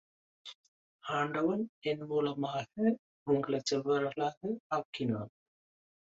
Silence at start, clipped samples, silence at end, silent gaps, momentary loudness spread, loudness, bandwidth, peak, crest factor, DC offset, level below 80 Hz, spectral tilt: 0.45 s; under 0.1%; 0.85 s; 0.55-0.99 s, 1.69-1.82 s, 2.99-3.26 s, 4.37-4.41 s, 4.60-4.70 s, 4.85-4.93 s; 16 LU; -34 LUFS; 8 kHz; -16 dBFS; 18 dB; under 0.1%; -76 dBFS; -5.5 dB/octave